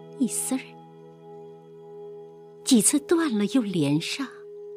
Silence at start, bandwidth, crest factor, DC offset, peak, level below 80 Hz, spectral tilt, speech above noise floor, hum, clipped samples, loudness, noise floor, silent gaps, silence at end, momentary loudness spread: 0 s; 15.5 kHz; 20 dB; under 0.1%; -8 dBFS; -74 dBFS; -4 dB/octave; 24 dB; none; under 0.1%; -24 LUFS; -47 dBFS; none; 0 s; 25 LU